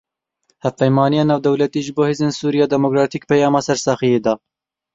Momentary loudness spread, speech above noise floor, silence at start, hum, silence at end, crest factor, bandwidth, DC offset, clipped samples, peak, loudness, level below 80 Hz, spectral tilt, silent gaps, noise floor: 5 LU; 50 dB; 0.65 s; none; 0.6 s; 16 dB; 8 kHz; under 0.1%; under 0.1%; -2 dBFS; -17 LUFS; -58 dBFS; -6 dB/octave; none; -66 dBFS